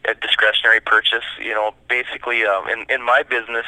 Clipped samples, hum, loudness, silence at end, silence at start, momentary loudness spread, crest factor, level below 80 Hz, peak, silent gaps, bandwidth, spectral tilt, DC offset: under 0.1%; none; -17 LUFS; 0 s; 0.05 s; 8 LU; 18 dB; -58 dBFS; 0 dBFS; none; 12 kHz; -1.5 dB/octave; under 0.1%